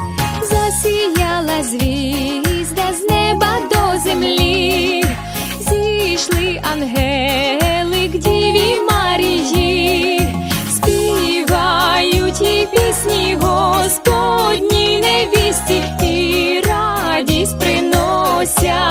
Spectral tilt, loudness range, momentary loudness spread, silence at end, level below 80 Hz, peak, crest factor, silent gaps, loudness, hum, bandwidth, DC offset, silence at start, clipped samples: -4 dB/octave; 2 LU; 5 LU; 0 s; -28 dBFS; 0 dBFS; 14 dB; none; -14 LUFS; none; 19 kHz; under 0.1%; 0 s; under 0.1%